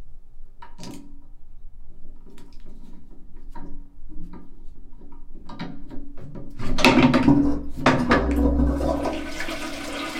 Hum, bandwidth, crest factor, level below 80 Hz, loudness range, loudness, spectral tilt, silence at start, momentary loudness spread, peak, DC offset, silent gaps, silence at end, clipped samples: none; 14 kHz; 24 dB; -32 dBFS; 22 LU; -21 LUFS; -5.5 dB/octave; 0 s; 26 LU; 0 dBFS; under 0.1%; none; 0 s; under 0.1%